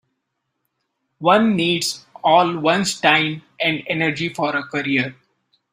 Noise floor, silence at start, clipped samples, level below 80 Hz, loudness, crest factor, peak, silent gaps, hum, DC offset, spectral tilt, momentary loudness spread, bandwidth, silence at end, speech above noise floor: -76 dBFS; 1.2 s; under 0.1%; -62 dBFS; -19 LUFS; 18 dB; -2 dBFS; none; none; under 0.1%; -4 dB/octave; 7 LU; 16 kHz; 0.6 s; 57 dB